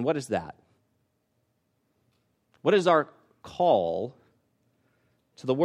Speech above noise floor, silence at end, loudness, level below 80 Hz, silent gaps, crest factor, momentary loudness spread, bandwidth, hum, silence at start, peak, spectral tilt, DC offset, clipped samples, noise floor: 49 dB; 0 s; -26 LUFS; -70 dBFS; none; 20 dB; 17 LU; 12.5 kHz; none; 0 s; -8 dBFS; -6 dB/octave; under 0.1%; under 0.1%; -74 dBFS